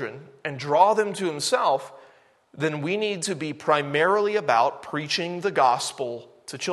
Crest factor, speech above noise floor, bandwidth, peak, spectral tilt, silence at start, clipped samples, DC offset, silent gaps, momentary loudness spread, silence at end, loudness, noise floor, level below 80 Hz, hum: 20 dB; 33 dB; 12.5 kHz; -4 dBFS; -3.5 dB/octave; 0 s; under 0.1%; under 0.1%; none; 13 LU; 0 s; -24 LUFS; -57 dBFS; -74 dBFS; none